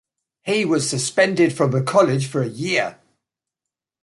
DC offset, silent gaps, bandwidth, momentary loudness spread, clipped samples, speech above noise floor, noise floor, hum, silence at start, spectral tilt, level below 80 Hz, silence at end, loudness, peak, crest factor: under 0.1%; none; 11.5 kHz; 7 LU; under 0.1%; 67 dB; -86 dBFS; none; 0.45 s; -5 dB/octave; -62 dBFS; 1.1 s; -19 LUFS; -4 dBFS; 18 dB